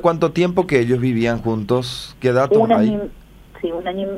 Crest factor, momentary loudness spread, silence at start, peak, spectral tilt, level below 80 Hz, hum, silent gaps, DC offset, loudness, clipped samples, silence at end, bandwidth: 16 dB; 11 LU; 0 s; -2 dBFS; -7 dB/octave; -44 dBFS; none; none; under 0.1%; -18 LUFS; under 0.1%; 0 s; 14.5 kHz